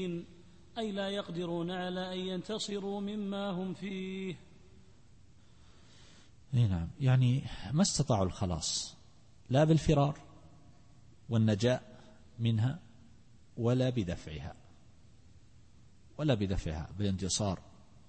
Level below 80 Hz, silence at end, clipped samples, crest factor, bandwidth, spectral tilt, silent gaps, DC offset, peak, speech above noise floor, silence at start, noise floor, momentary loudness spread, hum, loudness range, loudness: -52 dBFS; 0.5 s; under 0.1%; 20 dB; 8.8 kHz; -5.5 dB/octave; none; 0.1%; -14 dBFS; 29 dB; 0 s; -61 dBFS; 15 LU; none; 8 LU; -33 LUFS